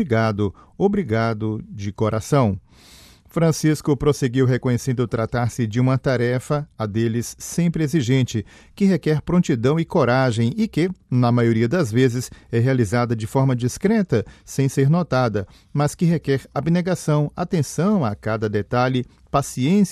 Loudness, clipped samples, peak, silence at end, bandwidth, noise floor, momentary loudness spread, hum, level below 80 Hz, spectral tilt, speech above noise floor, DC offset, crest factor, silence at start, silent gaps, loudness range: -21 LUFS; under 0.1%; -4 dBFS; 0 s; 14.5 kHz; -48 dBFS; 7 LU; none; -48 dBFS; -7 dB/octave; 28 dB; under 0.1%; 16 dB; 0 s; none; 2 LU